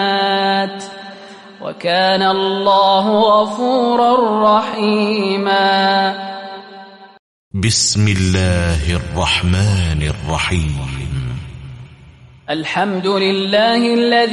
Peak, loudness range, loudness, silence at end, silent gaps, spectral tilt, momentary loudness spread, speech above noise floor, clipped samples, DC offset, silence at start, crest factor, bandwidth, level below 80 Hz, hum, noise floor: -2 dBFS; 6 LU; -15 LUFS; 0 s; 7.19-7.51 s; -4.5 dB/octave; 17 LU; 27 dB; under 0.1%; under 0.1%; 0 s; 14 dB; 11.5 kHz; -32 dBFS; none; -42 dBFS